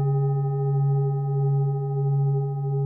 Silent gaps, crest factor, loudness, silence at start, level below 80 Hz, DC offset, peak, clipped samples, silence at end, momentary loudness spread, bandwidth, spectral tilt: none; 8 dB; -24 LUFS; 0 s; -70 dBFS; under 0.1%; -16 dBFS; under 0.1%; 0 s; 3 LU; 1.9 kHz; -15.5 dB/octave